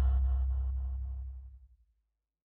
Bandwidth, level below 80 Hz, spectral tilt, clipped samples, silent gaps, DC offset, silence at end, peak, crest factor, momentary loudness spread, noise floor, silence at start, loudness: 1.8 kHz; -34 dBFS; -9.5 dB/octave; under 0.1%; none; under 0.1%; 0.8 s; -22 dBFS; 12 dB; 18 LU; -83 dBFS; 0 s; -35 LUFS